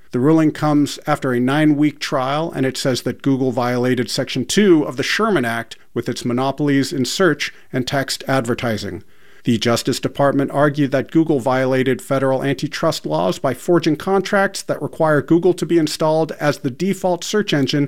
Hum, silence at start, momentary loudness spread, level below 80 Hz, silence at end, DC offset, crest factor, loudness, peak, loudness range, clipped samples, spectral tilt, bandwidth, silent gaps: none; 0.15 s; 6 LU; -54 dBFS; 0 s; 1%; 16 dB; -18 LUFS; -2 dBFS; 2 LU; under 0.1%; -5.5 dB/octave; 16.5 kHz; none